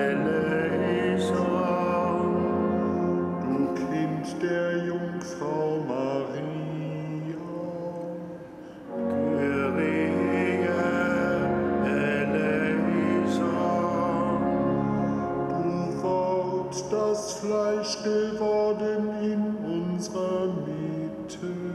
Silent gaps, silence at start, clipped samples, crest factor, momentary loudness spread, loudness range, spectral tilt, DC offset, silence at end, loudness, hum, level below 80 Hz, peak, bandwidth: none; 0 s; under 0.1%; 14 dB; 8 LU; 6 LU; -6.5 dB/octave; under 0.1%; 0 s; -27 LUFS; none; -58 dBFS; -14 dBFS; 12 kHz